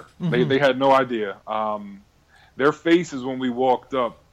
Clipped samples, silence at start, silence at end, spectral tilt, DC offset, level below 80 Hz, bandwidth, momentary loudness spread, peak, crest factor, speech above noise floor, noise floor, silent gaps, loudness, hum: under 0.1%; 0.2 s; 0.2 s; -6 dB/octave; under 0.1%; -60 dBFS; 10.5 kHz; 10 LU; -8 dBFS; 14 dB; 34 dB; -55 dBFS; none; -21 LUFS; none